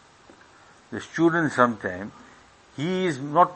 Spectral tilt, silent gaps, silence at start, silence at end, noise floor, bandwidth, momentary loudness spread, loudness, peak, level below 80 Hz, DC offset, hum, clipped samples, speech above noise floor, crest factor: -6 dB/octave; none; 0.9 s; 0 s; -53 dBFS; 8.6 kHz; 17 LU; -24 LUFS; -2 dBFS; -66 dBFS; under 0.1%; none; under 0.1%; 30 dB; 24 dB